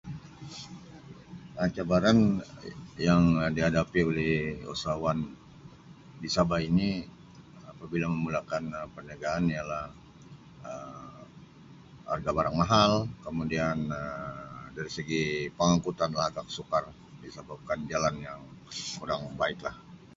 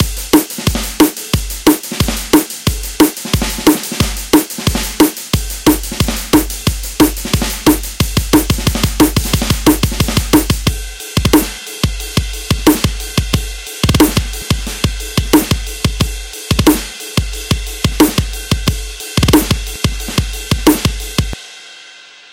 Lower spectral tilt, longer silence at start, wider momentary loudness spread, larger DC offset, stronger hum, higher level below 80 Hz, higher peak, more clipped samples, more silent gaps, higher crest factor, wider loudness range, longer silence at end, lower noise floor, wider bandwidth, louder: first, -6 dB/octave vs -4.5 dB/octave; about the same, 0.05 s vs 0 s; first, 22 LU vs 7 LU; neither; neither; second, -52 dBFS vs -22 dBFS; second, -8 dBFS vs 0 dBFS; neither; neither; first, 22 dB vs 14 dB; first, 8 LU vs 2 LU; second, 0.1 s vs 0.25 s; first, -52 dBFS vs -38 dBFS; second, 7.8 kHz vs 17.5 kHz; second, -29 LUFS vs -14 LUFS